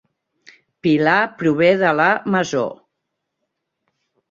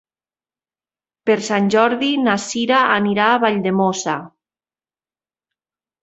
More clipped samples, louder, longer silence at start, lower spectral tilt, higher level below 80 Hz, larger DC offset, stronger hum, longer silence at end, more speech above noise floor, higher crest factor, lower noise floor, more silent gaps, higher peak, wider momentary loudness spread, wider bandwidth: neither; about the same, -17 LUFS vs -17 LUFS; second, 0.85 s vs 1.25 s; first, -6 dB/octave vs -4.5 dB/octave; about the same, -62 dBFS vs -64 dBFS; neither; neither; second, 1.55 s vs 1.75 s; second, 61 dB vs over 73 dB; about the same, 18 dB vs 18 dB; second, -77 dBFS vs under -90 dBFS; neither; about the same, -2 dBFS vs -2 dBFS; about the same, 8 LU vs 7 LU; about the same, 7.6 kHz vs 8.2 kHz